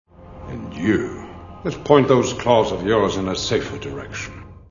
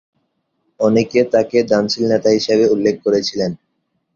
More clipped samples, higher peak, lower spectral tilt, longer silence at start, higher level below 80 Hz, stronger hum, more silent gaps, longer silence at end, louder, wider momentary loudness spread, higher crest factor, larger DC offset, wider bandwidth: neither; about the same, 0 dBFS vs -2 dBFS; about the same, -5.5 dB/octave vs -5.5 dB/octave; second, 0.2 s vs 0.8 s; first, -44 dBFS vs -56 dBFS; neither; neither; second, 0.1 s vs 0.6 s; second, -20 LUFS vs -16 LUFS; first, 18 LU vs 6 LU; first, 20 dB vs 14 dB; first, 0.1% vs under 0.1%; about the same, 7.4 kHz vs 7.6 kHz